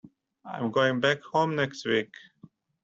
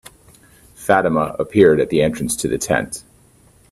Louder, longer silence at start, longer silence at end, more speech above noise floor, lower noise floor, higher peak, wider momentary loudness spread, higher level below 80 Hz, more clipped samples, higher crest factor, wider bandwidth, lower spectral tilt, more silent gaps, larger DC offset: second, -27 LUFS vs -17 LUFS; second, 0.05 s vs 0.8 s; about the same, 0.8 s vs 0.7 s; second, 29 dB vs 35 dB; first, -56 dBFS vs -51 dBFS; second, -10 dBFS vs 0 dBFS; about the same, 11 LU vs 12 LU; second, -70 dBFS vs -46 dBFS; neither; about the same, 20 dB vs 18 dB; second, 8 kHz vs 14.5 kHz; about the same, -5.5 dB/octave vs -5 dB/octave; neither; neither